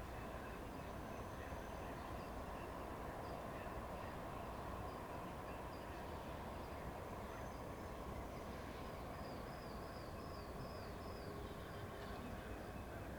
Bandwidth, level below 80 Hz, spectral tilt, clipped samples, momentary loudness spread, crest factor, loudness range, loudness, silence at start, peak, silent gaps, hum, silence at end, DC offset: over 20 kHz; -56 dBFS; -6 dB/octave; under 0.1%; 2 LU; 14 dB; 1 LU; -50 LUFS; 0 s; -36 dBFS; none; none; 0 s; under 0.1%